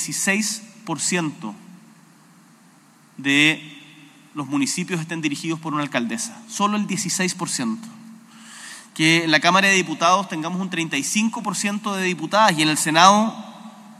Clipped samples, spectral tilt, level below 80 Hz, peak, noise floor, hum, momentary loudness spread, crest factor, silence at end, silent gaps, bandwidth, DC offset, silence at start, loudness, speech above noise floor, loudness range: under 0.1%; -3 dB/octave; -80 dBFS; 0 dBFS; -52 dBFS; none; 18 LU; 22 dB; 0.05 s; none; 15.5 kHz; under 0.1%; 0 s; -20 LUFS; 32 dB; 6 LU